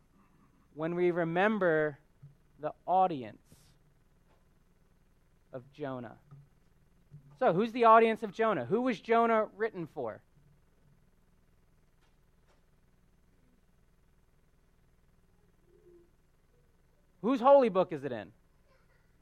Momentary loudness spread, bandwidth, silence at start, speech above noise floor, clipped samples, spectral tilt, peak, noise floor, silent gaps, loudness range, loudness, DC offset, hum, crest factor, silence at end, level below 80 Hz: 20 LU; 10 kHz; 0.75 s; 38 dB; under 0.1%; -7.5 dB/octave; -10 dBFS; -66 dBFS; none; 20 LU; -29 LUFS; under 0.1%; none; 24 dB; 0.95 s; -68 dBFS